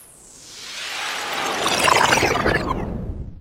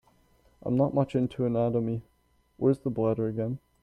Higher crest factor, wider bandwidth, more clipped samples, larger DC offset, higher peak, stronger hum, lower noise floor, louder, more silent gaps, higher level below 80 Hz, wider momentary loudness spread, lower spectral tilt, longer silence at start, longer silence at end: first, 22 dB vs 16 dB; first, 16 kHz vs 10.5 kHz; neither; neither; first, 0 dBFS vs -12 dBFS; neither; second, -44 dBFS vs -63 dBFS; first, -20 LUFS vs -28 LUFS; neither; first, -38 dBFS vs -58 dBFS; first, 17 LU vs 8 LU; second, -3 dB/octave vs -10 dB/octave; second, 0 s vs 0.65 s; second, 0 s vs 0.25 s